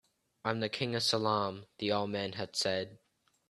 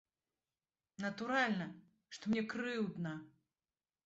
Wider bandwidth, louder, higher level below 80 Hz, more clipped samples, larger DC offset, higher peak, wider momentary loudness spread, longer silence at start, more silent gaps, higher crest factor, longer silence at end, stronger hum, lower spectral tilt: first, 13 kHz vs 8 kHz; first, -33 LUFS vs -39 LUFS; first, -72 dBFS vs -80 dBFS; neither; neither; first, -14 dBFS vs -20 dBFS; second, 8 LU vs 13 LU; second, 0.45 s vs 1 s; neither; about the same, 22 dB vs 22 dB; second, 0.55 s vs 0.8 s; neither; about the same, -4 dB/octave vs -4 dB/octave